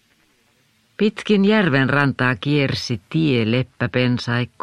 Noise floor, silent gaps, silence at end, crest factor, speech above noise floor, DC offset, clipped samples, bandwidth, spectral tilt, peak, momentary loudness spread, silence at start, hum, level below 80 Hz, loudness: -60 dBFS; none; 0.15 s; 18 dB; 42 dB; under 0.1%; under 0.1%; 10.5 kHz; -6.5 dB/octave; -2 dBFS; 7 LU; 1 s; none; -54 dBFS; -19 LUFS